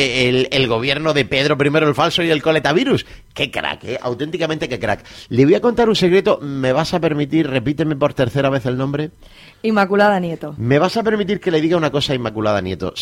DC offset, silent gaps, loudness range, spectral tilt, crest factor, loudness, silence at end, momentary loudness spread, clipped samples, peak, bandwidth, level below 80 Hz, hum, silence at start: under 0.1%; none; 3 LU; -6 dB/octave; 16 dB; -17 LUFS; 0 s; 9 LU; under 0.1%; -2 dBFS; 16 kHz; -46 dBFS; none; 0 s